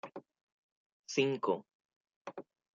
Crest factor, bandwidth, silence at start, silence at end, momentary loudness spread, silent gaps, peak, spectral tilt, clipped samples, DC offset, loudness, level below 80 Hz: 22 dB; 7.6 kHz; 0.05 s; 0.35 s; 21 LU; 0.43-1.04 s, 1.75-1.89 s, 1.96-2.05 s, 2.16-2.25 s; -18 dBFS; -4.5 dB/octave; under 0.1%; under 0.1%; -35 LUFS; -88 dBFS